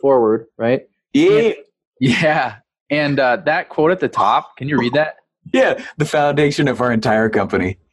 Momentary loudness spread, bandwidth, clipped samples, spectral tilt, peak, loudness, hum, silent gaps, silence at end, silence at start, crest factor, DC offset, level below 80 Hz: 6 LU; 12 kHz; under 0.1%; -6 dB/octave; -4 dBFS; -17 LUFS; none; 1.87-1.92 s, 2.81-2.86 s; 0.2 s; 0.05 s; 14 dB; under 0.1%; -52 dBFS